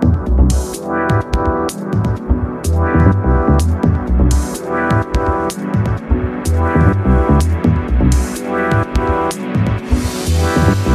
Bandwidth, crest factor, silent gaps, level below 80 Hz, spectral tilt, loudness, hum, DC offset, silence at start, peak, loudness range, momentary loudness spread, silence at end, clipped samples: 14.5 kHz; 12 dB; none; -18 dBFS; -6.5 dB/octave; -15 LUFS; none; under 0.1%; 0 s; 0 dBFS; 1 LU; 6 LU; 0 s; under 0.1%